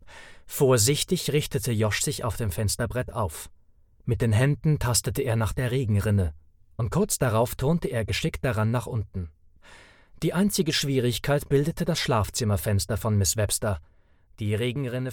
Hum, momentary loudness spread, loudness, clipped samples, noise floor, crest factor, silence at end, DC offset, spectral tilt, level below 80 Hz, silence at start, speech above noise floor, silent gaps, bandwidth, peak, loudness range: none; 9 LU; -25 LUFS; under 0.1%; -57 dBFS; 16 dB; 0 s; under 0.1%; -5 dB/octave; -42 dBFS; 0 s; 32 dB; none; 19 kHz; -10 dBFS; 3 LU